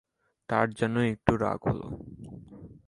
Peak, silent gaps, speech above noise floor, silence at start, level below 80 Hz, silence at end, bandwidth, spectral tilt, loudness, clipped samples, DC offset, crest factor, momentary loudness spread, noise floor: -4 dBFS; none; 20 dB; 0.5 s; -50 dBFS; 0.15 s; 11.5 kHz; -7.5 dB/octave; -28 LUFS; under 0.1%; under 0.1%; 26 dB; 19 LU; -48 dBFS